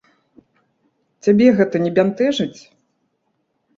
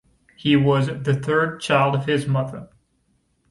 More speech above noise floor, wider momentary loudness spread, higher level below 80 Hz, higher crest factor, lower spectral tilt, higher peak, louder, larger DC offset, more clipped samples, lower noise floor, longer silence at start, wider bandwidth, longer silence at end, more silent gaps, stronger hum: first, 54 dB vs 46 dB; about the same, 10 LU vs 9 LU; second, -62 dBFS vs -54 dBFS; about the same, 18 dB vs 16 dB; about the same, -6.5 dB/octave vs -6.5 dB/octave; about the same, -2 dBFS vs -4 dBFS; first, -17 LUFS vs -21 LUFS; neither; neither; about the same, -69 dBFS vs -66 dBFS; first, 1.25 s vs 0.4 s; second, 7.6 kHz vs 11.5 kHz; first, 1.25 s vs 0.85 s; neither; neither